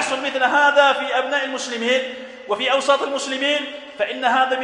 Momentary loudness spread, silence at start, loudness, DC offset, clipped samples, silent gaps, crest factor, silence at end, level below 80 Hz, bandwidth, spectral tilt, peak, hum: 11 LU; 0 s; -19 LUFS; under 0.1%; under 0.1%; none; 18 dB; 0 s; -70 dBFS; 11 kHz; -1 dB/octave; -2 dBFS; none